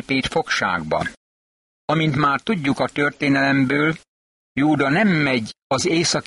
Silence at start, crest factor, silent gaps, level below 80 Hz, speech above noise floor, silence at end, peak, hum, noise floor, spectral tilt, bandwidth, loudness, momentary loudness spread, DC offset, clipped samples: 0.1 s; 14 dB; 1.17-1.88 s, 4.08-4.55 s, 5.62-5.70 s; -50 dBFS; over 71 dB; 0.05 s; -6 dBFS; none; under -90 dBFS; -5 dB/octave; 11.5 kHz; -20 LUFS; 7 LU; under 0.1%; under 0.1%